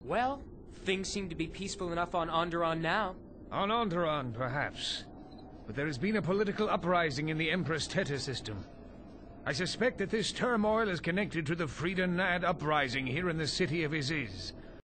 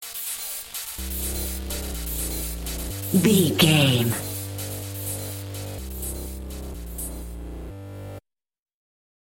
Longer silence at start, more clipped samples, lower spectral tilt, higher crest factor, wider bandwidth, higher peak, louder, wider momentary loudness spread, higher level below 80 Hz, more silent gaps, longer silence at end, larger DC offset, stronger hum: about the same, 0 s vs 0 s; neither; about the same, -5 dB/octave vs -4 dB/octave; second, 16 dB vs 24 dB; second, 9 kHz vs 17 kHz; second, -16 dBFS vs -4 dBFS; second, -33 LUFS vs -25 LUFS; second, 13 LU vs 19 LU; second, -54 dBFS vs -38 dBFS; neither; second, 0.05 s vs 1.05 s; neither; neither